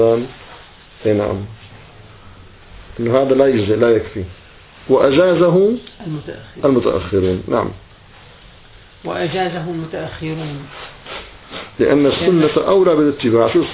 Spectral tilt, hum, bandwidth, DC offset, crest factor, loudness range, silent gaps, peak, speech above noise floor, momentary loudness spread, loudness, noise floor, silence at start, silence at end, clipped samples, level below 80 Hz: -11 dB/octave; none; 4 kHz; under 0.1%; 16 dB; 10 LU; none; 0 dBFS; 27 dB; 19 LU; -16 LUFS; -43 dBFS; 0 s; 0 s; under 0.1%; -42 dBFS